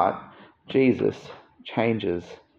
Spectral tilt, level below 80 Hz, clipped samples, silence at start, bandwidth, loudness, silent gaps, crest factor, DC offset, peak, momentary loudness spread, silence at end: -7.5 dB/octave; -66 dBFS; under 0.1%; 0 s; 7.2 kHz; -25 LUFS; none; 20 dB; under 0.1%; -6 dBFS; 20 LU; 0.25 s